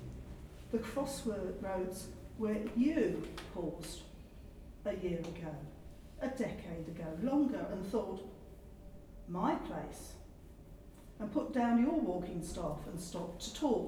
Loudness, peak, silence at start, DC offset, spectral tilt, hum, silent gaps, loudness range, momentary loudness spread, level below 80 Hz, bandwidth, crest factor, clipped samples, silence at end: -38 LUFS; -20 dBFS; 0 s; under 0.1%; -6 dB/octave; none; none; 6 LU; 22 LU; -54 dBFS; 18 kHz; 18 dB; under 0.1%; 0 s